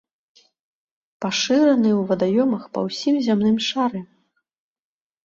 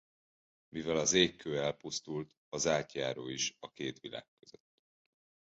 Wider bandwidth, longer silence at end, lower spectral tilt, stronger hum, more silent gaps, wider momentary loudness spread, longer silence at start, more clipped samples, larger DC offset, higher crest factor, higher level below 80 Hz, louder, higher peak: about the same, 7.6 kHz vs 8 kHz; second, 1.2 s vs 1.35 s; first, -5 dB/octave vs -3 dB/octave; neither; second, none vs 2.37-2.52 s; second, 9 LU vs 16 LU; first, 1.2 s vs 0.75 s; neither; neither; second, 16 dB vs 24 dB; first, -62 dBFS vs -68 dBFS; first, -20 LUFS vs -34 LUFS; first, -6 dBFS vs -12 dBFS